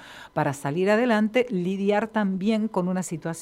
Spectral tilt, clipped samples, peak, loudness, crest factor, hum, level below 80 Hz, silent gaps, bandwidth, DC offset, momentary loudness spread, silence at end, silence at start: -6 dB/octave; under 0.1%; -8 dBFS; -24 LUFS; 16 dB; none; -64 dBFS; none; 14.5 kHz; under 0.1%; 7 LU; 0 s; 0 s